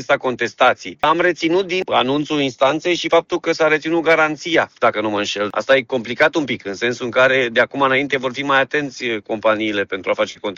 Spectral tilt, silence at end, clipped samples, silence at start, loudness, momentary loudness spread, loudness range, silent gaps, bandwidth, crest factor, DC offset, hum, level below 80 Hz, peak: -4 dB/octave; 0 s; under 0.1%; 0 s; -17 LUFS; 6 LU; 1 LU; none; 7.6 kHz; 14 dB; under 0.1%; none; -58 dBFS; -2 dBFS